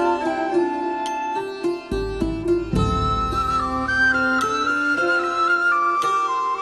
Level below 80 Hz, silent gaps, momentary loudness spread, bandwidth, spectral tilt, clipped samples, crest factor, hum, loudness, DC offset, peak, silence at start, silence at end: -36 dBFS; none; 8 LU; 12.5 kHz; -5.5 dB/octave; under 0.1%; 12 dB; none; -21 LUFS; under 0.1%; -8 dBFS; 0 s; 0 s